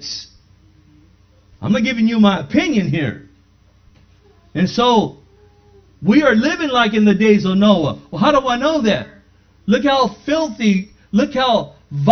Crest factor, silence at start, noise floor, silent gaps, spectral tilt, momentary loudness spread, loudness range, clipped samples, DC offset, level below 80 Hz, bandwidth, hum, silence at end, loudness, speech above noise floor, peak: 16 dB; 0 s; -52 dBFS; none; -6 dB/octave; 12 LU; 5 LU; under 0.1%; under 0.1%; -48 dBFS; 6.6 kHz; none; 0 s; -16 LUFS; 37 dB; 0 dBFS